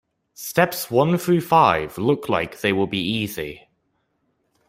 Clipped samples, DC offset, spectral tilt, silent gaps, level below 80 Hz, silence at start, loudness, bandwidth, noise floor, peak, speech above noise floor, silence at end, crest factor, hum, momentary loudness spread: under 0.1%; under 0.1%; -5.5 dB/octave; none; -56 dBFS; 0.4 s; -20 LUFS; 16 kHz; -70 dBFS; -2 dBFS; 50 dB; 1.1 s; 20 dB; none; 11 LU